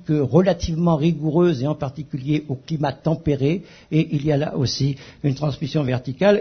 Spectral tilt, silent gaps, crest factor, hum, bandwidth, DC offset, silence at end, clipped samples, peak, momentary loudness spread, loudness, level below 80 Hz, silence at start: -7.5 dB/octave; none; 18 dB; none; 6.6 kHz; under 0.1%; 0 s; under 0.1%; -2 dBFS; 7 LU; -21 LUFS; -44 dBFS; 0 s